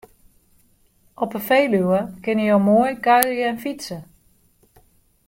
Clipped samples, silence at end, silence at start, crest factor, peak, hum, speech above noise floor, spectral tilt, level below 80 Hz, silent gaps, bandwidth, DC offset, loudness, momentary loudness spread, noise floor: under 0.1%; 1.25 s; 1.2 s; 22 dB; 0 dBFS; none; 40 dB; -5.5 dB/octave; -58 dBFS; none; 16.5 kHz; under 0.1%; -19 LUFS; 13 LU; -59 dBFS